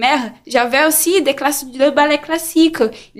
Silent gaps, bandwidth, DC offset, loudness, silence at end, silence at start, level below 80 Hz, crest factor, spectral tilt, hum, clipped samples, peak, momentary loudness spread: none; 15.5 kHz; under 0.1%; -15 LUFS; 0.15 s; 0 s; -52 dBFS; 14 dB; -1.5 dB/octave; none; under 0.1%; -2 dBFS; 7 LU